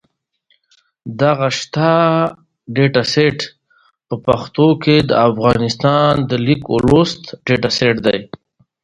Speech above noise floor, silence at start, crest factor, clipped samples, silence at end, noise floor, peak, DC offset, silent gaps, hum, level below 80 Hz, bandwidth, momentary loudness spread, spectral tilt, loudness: 52 dB; 1.05 s; 16 dB; under 0.1%; 0.6 s; -67 dBFS; 0 dBFS; under 0.1%; none; none; -42 dBFS; 10.5 kHz; 10 LU; -6 dB/octave; -15 LUFS